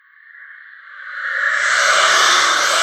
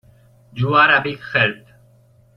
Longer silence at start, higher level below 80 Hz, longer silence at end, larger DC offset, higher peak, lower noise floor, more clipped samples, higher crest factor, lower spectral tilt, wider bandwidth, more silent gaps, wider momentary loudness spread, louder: second, 0.4 s vs 0.55 s; second, -70 dBFS vs -56 dBFS; second, 0 s vs 0.8 s; neither; about the same, 0 dBFS vs -2 dBFS; second, -42 dBFS vs -53 dBFS; neither; about the same, 18 dB vs 18 dB; second, 2.5 dB/octave vs -7 dB/octave; first, 15 kHz vs 6 kHz; neither; second, 16 LU vs 21 LU; first, -13 LUFS vs -16 LUFS